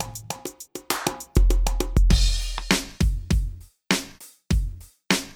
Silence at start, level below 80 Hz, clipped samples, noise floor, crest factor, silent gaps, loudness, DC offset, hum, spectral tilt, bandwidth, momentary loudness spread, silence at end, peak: 0 s; -24 dBFS; under 0.1%; -43 dBFS; 22 dB; none; -25 LUFS; under 0.1%; none; -4 dB/octave; 17 kHz; 14 LU; 0 s; 0 dBFS